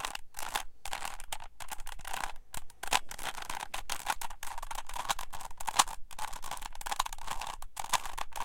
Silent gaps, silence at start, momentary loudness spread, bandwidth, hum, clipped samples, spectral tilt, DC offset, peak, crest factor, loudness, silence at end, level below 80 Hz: none; 0 s; 11 LU; 17 kHz; none; under 0.1%; 0 dB/octave; under 0.1%; -6 dBFS; 28 dB; -37 LUFS; 0 s; -46 dBFS